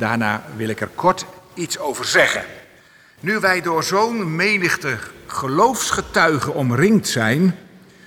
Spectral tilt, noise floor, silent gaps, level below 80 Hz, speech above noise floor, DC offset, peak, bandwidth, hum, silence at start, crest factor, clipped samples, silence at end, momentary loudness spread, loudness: -4.5 dB/octave; -49 dBFS; none; -52 dBFS; 31 dB; under 0.1%; -4 dBFS; over 20 kHz; none; 0 s; 16 dB; under 0.1%; 0.45 s; 11 LU; -19 LUFS